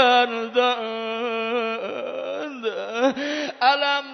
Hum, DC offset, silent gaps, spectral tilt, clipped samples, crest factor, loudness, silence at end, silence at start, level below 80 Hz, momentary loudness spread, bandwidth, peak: none; under 0.1%; none; -2.5 dB/octave; under 0.1%; 18 dB; -23 LUFS; 0 s; 0 s; -78 dBFS; 10 LU; 6.4 kHz; -4 dBFS